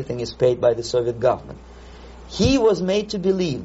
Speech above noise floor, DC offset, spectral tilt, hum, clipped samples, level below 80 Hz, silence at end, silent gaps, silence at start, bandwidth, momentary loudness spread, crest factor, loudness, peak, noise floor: 20 dB; under 0.1%; -5.5 dB/octave; none; under 0.1%; -40 dBFS; 0 s; none; 0 s; 8 kHz; 12 LU; 16 dB; -20 LUFS; -4 dBFS; -41 dBFS